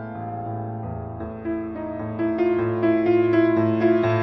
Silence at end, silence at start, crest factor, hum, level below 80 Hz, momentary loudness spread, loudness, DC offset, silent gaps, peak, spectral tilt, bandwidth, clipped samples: 0 s; 0 s; 14 dB; none; -50 dBFS; 13 LU; -23 LUFS; under 0.1%; none; -8 dBFS; -10 dB/octave; 5.8 kHz; under 0.1%